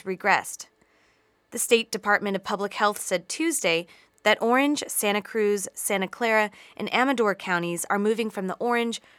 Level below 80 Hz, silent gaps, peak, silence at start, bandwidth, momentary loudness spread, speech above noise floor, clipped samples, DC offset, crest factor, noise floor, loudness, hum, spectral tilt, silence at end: -74 dBFS; none; -4 dBFS; 0.05 s; 18 kHz; 7 LU; 40 dB; under 0.1%; under 0.1%; 20 dB; -65 dBFS; -25 LUFS; none; -3 dB/octave; 0.2 s